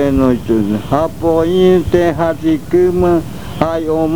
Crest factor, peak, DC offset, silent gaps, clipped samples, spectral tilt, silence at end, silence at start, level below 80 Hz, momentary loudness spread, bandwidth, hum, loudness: 14 dB; 0 dBFS; 3%; none; under 0.1%; -7.5 dB/octave; 0 s; 0 s; -32 dBFS; 6 LU; 20 kHz; none; -13 LUFS